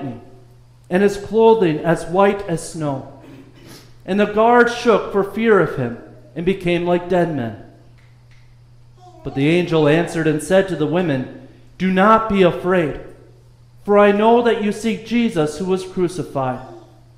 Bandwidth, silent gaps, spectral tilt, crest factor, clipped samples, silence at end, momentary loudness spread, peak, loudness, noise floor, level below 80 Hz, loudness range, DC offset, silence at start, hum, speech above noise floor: 14.5 kHz; none; -6.5 dB/octave; 16 dB; under 0.1%; 0.4 s; 15 LU; -2 dBFS; -17 LUFS; -46 dBFS; -46 dBFS; 4 LU; under 0.1%; 0 s; none; 30 dB